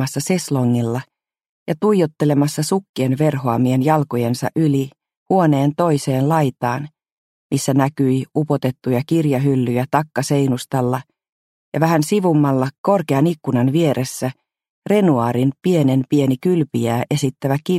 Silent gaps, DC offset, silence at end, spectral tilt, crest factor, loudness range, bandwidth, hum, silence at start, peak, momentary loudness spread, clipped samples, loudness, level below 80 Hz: 1.49-1.66 s, 2.89-2.94 s, 5.17-5.26 s, 7.12-7.50 s, 11.32-11.72 s, 12.78-12.84 s, 14.70-14.82 s; under 0.1%; 0 s; -6.5 dB/octave; 18 dB; 2 LU; 15.5 kHz; none; 0 s; 0 dBFS; 6 LU; under 0.1%; -18 LUFS; -58 dBFS